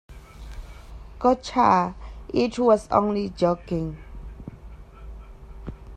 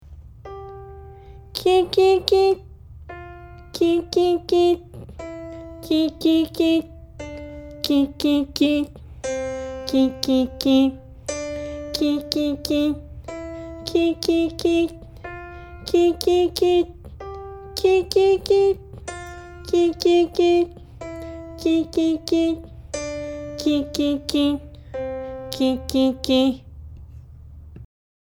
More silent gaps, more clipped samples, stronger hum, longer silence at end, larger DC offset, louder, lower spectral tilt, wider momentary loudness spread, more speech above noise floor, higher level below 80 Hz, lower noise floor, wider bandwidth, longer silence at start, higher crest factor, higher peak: neither; neither; neither; second, 0 s vs 0.45 s; neither; about the same, -23 LUFS vs -21 LUFS; first, -6.5 dB/octave vs -5 dB/octave; first, 25 LU vs 19 LU; about the same, 21 dB vs 23 dB; about the same, -42 dBFS vs -44 dBFS; about the same, -43 dBFS vs -41 dBFS; second, 12 kHz vs 17 kHz; about the same, 0.1 s vs 0.05 s; about the same, 22 dB vs 22 dB; second, -4 dBFS vs 0 dBFS